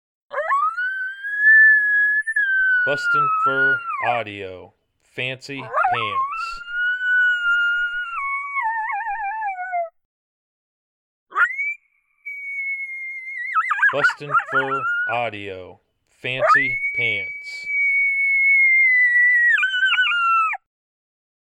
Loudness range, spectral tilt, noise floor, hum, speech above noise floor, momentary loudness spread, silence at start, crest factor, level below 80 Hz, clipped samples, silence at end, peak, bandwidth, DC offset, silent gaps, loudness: 11 LU; -3 dB/octave; -61 dBFS; none; 39 dB; 15 LU; 0.3 s; 14 dB; -60 dBFS; under 0.1%; 0.85 s; -6 dBFS; 11.5 kHz; under 0.1%; 10.05-11.26 s; -18 LUFS